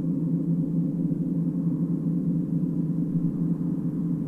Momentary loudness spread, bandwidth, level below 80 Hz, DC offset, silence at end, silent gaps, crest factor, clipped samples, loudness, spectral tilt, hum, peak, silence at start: 1 LU; 1.8 kHz; -56 dBFS; under 0.1%; 0 s; none; 12 dB; under 0.1%; -27 LUFS; -12.5 dB/octave; none; -14 dBFS; 0 s